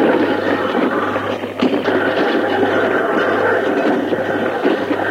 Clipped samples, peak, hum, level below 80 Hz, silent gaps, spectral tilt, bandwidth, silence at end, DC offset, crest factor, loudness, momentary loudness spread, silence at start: under 0.1%; -2 dBFS; none; -62 dBFS; none; -6 dB/octave; 16 kHz; 0 s; under 0.1%; 14 dB; -17 LUFS; 3 LU; 0 s